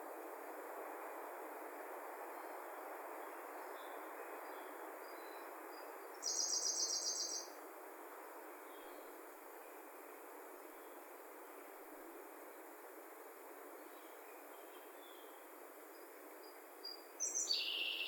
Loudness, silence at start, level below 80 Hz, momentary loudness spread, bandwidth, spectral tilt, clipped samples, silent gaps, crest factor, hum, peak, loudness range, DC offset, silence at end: -46 LUFS; 0 s; under -90 dBFS; 18 LU; 18 kHz; 3.5 dB/octave; under 0.1%; none; 22 dB; none; -26 dBFS; 13 LU; under 0.1%; 0 s